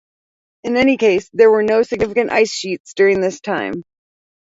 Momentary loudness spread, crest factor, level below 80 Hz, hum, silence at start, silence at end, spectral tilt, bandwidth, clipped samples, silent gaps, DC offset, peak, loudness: 12 LU; 16 dB; -52 dBFS; none; 0.65 s; 0.6 s; -4.5 dB/octave; 7.8 kHz; under 0.1%; 2.80-2.84 s; under 0.1%; 0 dBFS; -16 LUFS